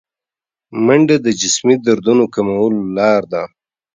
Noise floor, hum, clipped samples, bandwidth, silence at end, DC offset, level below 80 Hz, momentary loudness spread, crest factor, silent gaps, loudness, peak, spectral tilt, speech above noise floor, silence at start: -89 dBFS; none; under 0.1%; 9.6 kHz; 0.5 s; under 0.1%; -56 dBFS; 11 LU; 14 dB; none; -14 LUFS; 0 dBFS; -4.5 dB/octave; 76 dB; 0.7 s